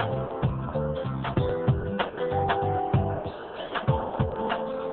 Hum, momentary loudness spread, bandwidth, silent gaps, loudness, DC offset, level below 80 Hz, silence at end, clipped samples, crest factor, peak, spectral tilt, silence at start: none; 5 LU; 4.3 kHz; none; -28 LUFS; under 0.1%; -42 dBFS; 0 s; under 0.1%; 18 dB; -10 dBFS; -10.5 dB/octave; 0 s